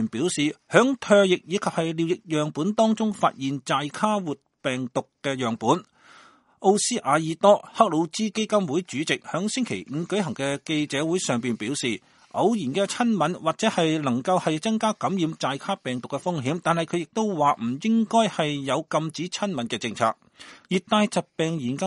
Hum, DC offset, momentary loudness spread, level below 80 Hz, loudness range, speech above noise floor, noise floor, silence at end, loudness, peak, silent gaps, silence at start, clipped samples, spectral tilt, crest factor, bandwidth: none; under 0.1%; 8 LU; -68 dBFS; 4 LU; 30 dB; -54 dBFS; 0 s; -24 LUFS; -2 dBFS; none; 0 s; under 0.1%; -4.5 dB/octave; 24 dB; 11.5 kHz